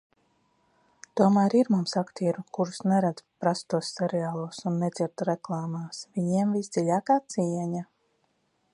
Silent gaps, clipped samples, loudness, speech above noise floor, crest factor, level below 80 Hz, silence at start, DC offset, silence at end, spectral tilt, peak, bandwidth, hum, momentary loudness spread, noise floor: none; under 0.1%; -27 LUFS; 45 dB; 20 dB; -74 dBFS; 1.15 s; under 0.1%; 0.9 s; -6.5 dB/octave; -8 dBFS; 11 kHz; none; 10 LU; -72 dBFS